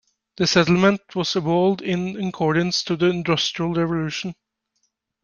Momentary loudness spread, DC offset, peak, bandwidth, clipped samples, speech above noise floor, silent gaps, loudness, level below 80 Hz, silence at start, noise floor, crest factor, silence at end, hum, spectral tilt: 8 LU; under 0.1%; -2 dBFS; 7.2 kHz; under 0.1%; 52 dB; none; -21 LUFS; -54 dBFS; 0.4 s; -73 dBFS; 20 dB; 0.9 s; none; -5 dB/octave